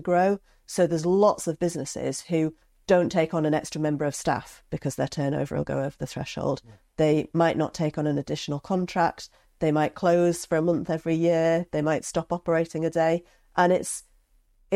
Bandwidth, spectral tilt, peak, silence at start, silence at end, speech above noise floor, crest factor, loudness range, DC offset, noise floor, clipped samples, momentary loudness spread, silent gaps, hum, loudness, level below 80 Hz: 15.5 kHz; -6 dB/octave; -6 dBFS; 0 s; 0 s; 37 dB; 18 dB; 3 LU; under 0.1%; -62 dBFS; under 0.1%; 10 LU; none; none; -26 LUFS; -56 dBFS